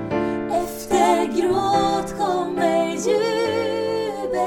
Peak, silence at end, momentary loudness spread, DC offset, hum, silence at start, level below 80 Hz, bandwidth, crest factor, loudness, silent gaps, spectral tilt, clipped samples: -4 dBFS; 0 s; 6 LU; under 0.1%; none; 0 s; -48 dBFS; 18.5 kHz; 16 dB; -21 LUFS; none; -4.5 dB/octave; under 0.1%